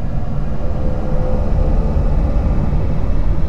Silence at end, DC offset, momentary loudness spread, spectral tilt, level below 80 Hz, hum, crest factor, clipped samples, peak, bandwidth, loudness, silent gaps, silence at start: 0 s; under 0.1%; 5 LU; -9.5 dB/octave; -16 dBFS; none; 12 dB; under 0.1%; -4 dBFS; 5.6 kHz; -20 LUFS; none; 0 s